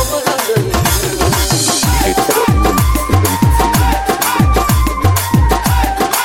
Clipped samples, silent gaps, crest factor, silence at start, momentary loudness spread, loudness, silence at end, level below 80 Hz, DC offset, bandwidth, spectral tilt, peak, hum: under 0.1%; none; 12 dB; 0 s; 2 LU; -13 LUFS; 0 s; -18 dBFS; 0.2%; 17 kHz; -4.5 dB/octave; 0 dBFS; none